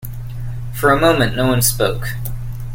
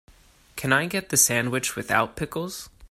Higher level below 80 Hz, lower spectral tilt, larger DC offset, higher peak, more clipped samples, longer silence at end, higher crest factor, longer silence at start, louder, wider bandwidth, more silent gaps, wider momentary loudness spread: first, -30 dBFS vs -54 dBFS; first, -4.5 dB/octave vs -2.5 dB/octave; neither; first, 0 dBFS vs -4 dBFS; neither; about the same, 0 s vs 0.05 s; second, 16 dB vs 22 dB; second, 0 s vs 0.55 s; first, -16 LUFS vs -23 LUFS; about the same, 17 kHz vs 16 kHz; neither; about the same, 15 LU vs 15 LU